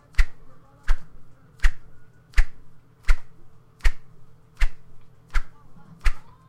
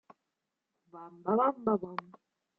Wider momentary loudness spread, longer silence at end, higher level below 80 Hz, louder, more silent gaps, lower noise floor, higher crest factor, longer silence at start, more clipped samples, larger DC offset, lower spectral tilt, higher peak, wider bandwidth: about the same, 20 LU vs 21 LU; second, 0.3 s vs 0.55 s; first, -26 dBFS vs -78 dBFS; about the same, -31 LUFS vs -32 LUFS; neither; second, -43 dBFS vs -86 dBFS; about the same, 20 dB vs 20 dB; second, 0.2 s vs 0.95 s; neither; neither; second, -3.5 dB/octave vs -7 dB/octave; first, -2 dBFS vs -16 dBFS; first, 8.6 kHz vs 5.4 kHz